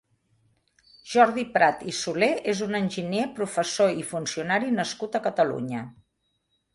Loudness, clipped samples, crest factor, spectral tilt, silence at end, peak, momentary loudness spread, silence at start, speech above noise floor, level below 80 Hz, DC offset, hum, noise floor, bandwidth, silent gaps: -25 LUFS; under 0.1%; 22 dB; -4 dB/octave; 0.8 s; -6 dBFS; 9 LU; 1.05 s; 50 dB; -66 dBFS; under 0.1%; none; -74 dBFS; 11.5 kHz; none